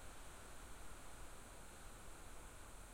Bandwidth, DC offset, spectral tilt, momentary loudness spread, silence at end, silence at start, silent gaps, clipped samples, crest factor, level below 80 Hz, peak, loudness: 16.5 kHz; under 0.1%; -3 dB/octave; 1 LU; 0 s; 0 s; none; under 0.1%; 12 dB; -60 dBFS; -42 dBFS; -58 LUFS